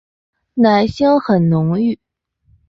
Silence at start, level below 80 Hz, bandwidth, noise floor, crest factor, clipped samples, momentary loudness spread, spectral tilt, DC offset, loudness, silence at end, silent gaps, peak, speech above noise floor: 0.55 s; -46 dBFS; 7.4 kHz; -57 dBFS; 14 dB; under 0.1%; 9 LU; -8.5 dB/octave; under 0.1%; -15 LUFS; 0.75 s; none; -2 dBFS; 44 dB